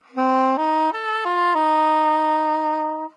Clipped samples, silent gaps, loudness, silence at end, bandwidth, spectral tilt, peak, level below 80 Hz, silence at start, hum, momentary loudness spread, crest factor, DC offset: under 0.1%; none; -19 LUFS; 0.05 s; 10 kHz; -3.5 dB/octave; -8 dBFS; -90 dBFS; 0.15 s; none; 5 LU; 12 dB; under 0.1%